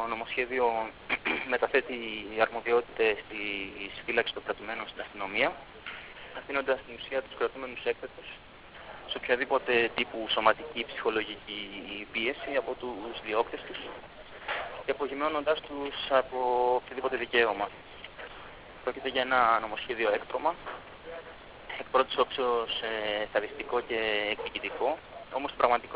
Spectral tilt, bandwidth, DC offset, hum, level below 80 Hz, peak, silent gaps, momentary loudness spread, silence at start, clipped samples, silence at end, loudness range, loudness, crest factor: -0.5 dB/octave; 4 kHz; under 0.1%; none; -60 dBFS; -8 dBFS; none; 16 LU; 0 s; under 0.1%; 0 s; 4 LU; -30 LUFS; 24 dB